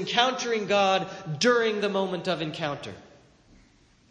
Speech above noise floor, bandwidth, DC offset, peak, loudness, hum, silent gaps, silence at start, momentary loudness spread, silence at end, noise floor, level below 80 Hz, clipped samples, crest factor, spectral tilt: 34 dB; 10 kHz; under 0.1%; -6 dBFS; -25 LUFS; none; none; 0 s; 11 LU; 1.1 s; -59 dBFS; -66 dBFS; under 0.1%; 22 dB; -4 dB/octave